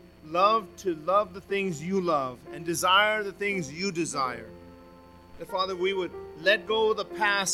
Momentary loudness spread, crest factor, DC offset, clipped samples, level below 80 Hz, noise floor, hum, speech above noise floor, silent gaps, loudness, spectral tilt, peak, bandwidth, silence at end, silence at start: 12 LU; 20 dB; under 0.1%; under 0.1%; -60 dBFS; -51 dBFS; 60 Hz at -55 dBFS; 24 dB; none; -27 LUFS; -3 dB/octave; -8 dBFS; 16.5 kHz; 0 s; 0.25 s